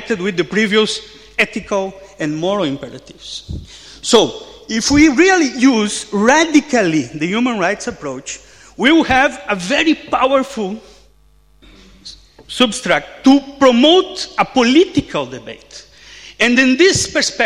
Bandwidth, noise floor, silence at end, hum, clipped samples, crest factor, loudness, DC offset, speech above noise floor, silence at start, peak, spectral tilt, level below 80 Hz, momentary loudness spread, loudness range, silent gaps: 12.5 kHz; -51 dBFS; 0 s; none; under 0.1%; 16 dB; -14 LUFS; under 0.1%; 36 dB; 0 s; 0 dBFS; -3.5 dB/octave; -44 dBFS; 18 LU; 6 LU; none